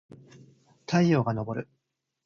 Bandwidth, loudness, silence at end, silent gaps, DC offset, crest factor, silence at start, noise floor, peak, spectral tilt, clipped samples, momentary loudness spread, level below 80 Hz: 7 kHz; -27 LUFS; 0.6 s; none; under 0.1%; 20 dB; 0.9 s; -57 dBFS; -10 dBFS; -7 dB/octave; under 0.1%; 23 LU; -62 dBFS